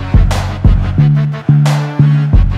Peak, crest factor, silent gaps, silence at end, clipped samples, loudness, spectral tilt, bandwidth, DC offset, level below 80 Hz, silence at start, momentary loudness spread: 0 dBFS; 10 dB; none; 0 s; under 0.1%; -12 LUFS; -7.5 dB/octave; 10.5 kHz; under 0.1%; -14 dBFS; 0 s; 3 LU